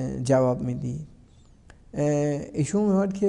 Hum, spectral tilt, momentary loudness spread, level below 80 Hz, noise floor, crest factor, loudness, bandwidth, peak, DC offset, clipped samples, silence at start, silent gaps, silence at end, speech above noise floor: none; -7.5 dB/octave; 14 LU; -52 dBFS; -53 dBFS; 16 dB; -25 LUFS; 11 kHz; -10 dBFS; under 0.1%; under 0.1%; 0 s; none; 0 s; 29 dB